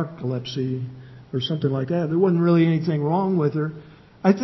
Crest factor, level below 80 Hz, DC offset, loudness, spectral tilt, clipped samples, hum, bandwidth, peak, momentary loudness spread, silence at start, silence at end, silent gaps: 18 dB; -60 dBFS; under 0.1%; -22 LUFS; -8.5 dB/octave; under 0.1%; none; 6 kHz; -4 dBFS; 13 LU; 0 s; 0 s; none